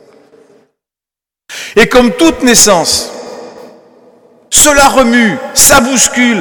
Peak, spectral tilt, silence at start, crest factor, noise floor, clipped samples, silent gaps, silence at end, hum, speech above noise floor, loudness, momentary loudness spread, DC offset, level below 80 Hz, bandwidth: 0 dBFS; -2 dB/octave; 1.5 s; 10 dB; -88 dBFS; 2%; none; 0 s; none; 81 dB; -6 LUFS; 20 LU; under 0.1%; -32 dBFS; over 20 kHz